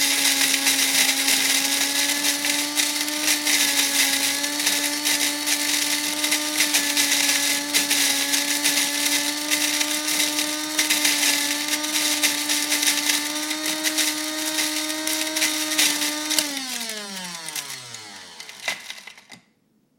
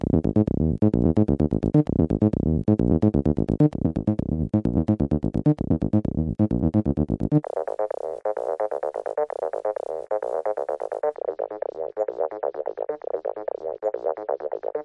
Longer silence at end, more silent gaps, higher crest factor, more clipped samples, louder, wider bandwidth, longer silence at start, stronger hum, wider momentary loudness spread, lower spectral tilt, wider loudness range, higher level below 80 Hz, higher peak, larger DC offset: first, 0.65 s vs 0 s; neither; first, 22 dB vs 16 dB; neither; first, -20 LUFS vs -24 LUFS; first, 17 kHz vs 5.6 kHz; about the same, 0 s vs 0 s; neither; first, 12 LU vs 9 LU; second, 1 dB/octave vs -11.5 dB/octave; about the same, 5 LU vs 7 LU; second, -76 dBFS vs -38 dBFS; first, 0 dBFS vs -8 dBFS; neither